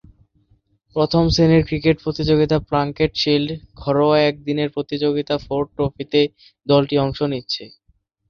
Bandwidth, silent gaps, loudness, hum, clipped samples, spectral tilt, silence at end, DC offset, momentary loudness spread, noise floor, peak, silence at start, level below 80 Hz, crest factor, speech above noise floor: 7 kHz; none; -19 LUFS; none; under 0.1%; -6.5 dB/octave; 0.6 s; under 0.1%; 9 LU; -62 dBFS; -2 dBFS; 0.95 s; -40 dBFS; 16 dB; 44 dB